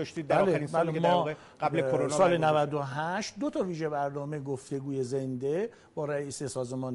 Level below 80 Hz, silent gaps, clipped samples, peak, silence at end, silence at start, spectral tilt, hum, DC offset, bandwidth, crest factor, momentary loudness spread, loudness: -66 dBFS; none; under 0.1%; -12 dBFS; 0 s; 0 s; -6 dB/octave; none; under 0.1%; 11.5 kHz; 16 dB; 10 LU; -30 LUFS